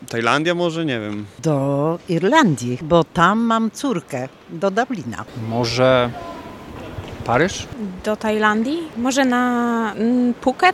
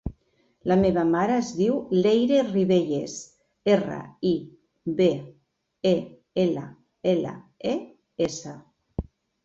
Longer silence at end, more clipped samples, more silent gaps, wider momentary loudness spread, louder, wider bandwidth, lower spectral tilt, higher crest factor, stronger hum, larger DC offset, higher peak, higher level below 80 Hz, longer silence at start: second, 0 s vs 0.4 s; neither; neither; about the same, 14 LU vs 16 LU; first, -19 LUFS vs -25 LUFS; first, 13.5 kHz vs 7.8 kHz; about the same, -5.5 dB/octave vs -6.5 dB/octave; about the same, 20 dB vs 18 dB; neither; neither; first, 0 dBFS vs -8 dBFS; about the same, -48 dBFS vs -50 dBFS; about the same, 0 s vs 0.05 s